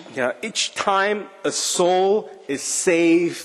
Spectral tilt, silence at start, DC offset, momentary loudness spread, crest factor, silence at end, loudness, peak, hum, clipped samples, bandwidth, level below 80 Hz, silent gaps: -2.5 dB/octave; 0 s; under 0.1%; 8 LU; 16 dB; 0 s; -20 LUFS; -4 dBFS; none; under 0.1%; 13 kHz; -68 dBFS; none